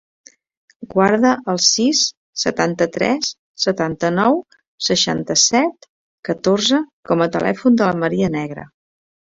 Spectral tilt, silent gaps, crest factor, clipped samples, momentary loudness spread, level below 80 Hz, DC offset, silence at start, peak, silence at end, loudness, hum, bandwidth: -3.5 dB/octave; 2.17-2.33 s, 3.39-3.55 s, 4.67-4.78 s, 5.89-6.23 s, 6.93-7.03 s; 16 dB; under 0.1%; 9 LU; -56 dBFS; under 0.1%; 0.8 s; -2 dBFS; 0.75 s; -17 LUFS; none; 7.8 kHz